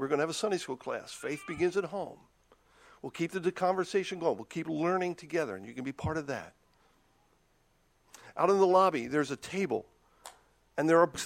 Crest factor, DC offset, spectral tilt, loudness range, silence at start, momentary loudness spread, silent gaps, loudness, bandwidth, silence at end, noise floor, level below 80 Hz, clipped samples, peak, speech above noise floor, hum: 22 dB; under 0.1%; -5 dB/octave; 5 LU; 0 s; 17 LU; none; -31 LUFS; 15.5 kHz; 0 s; -69 dBFS; -66 dBFS; under 0.1%; -10 dBFS; 39 dB; none